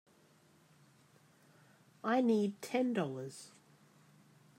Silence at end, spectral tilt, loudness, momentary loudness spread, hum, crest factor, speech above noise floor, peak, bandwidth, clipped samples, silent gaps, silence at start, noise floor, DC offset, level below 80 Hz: 1.1 s; -6 dB/octave; -35 LUFS; 19 LU; none; 18 dB; 33 dB; -22 dBFS; 16 kHz; under 0.1%; none; 2.05 s; -67 dBFS; under 0.1%; under -90 dBFS